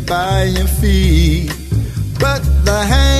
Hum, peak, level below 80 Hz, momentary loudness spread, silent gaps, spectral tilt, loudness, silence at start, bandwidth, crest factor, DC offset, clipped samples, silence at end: none; 0 dBFS; -16 dBFS; 7 LU; none; -5.5 dB/octave; -15 LUFS; 0 s; 14 kHz; 12 dB; under 0.1%; under 0.1%; 0 s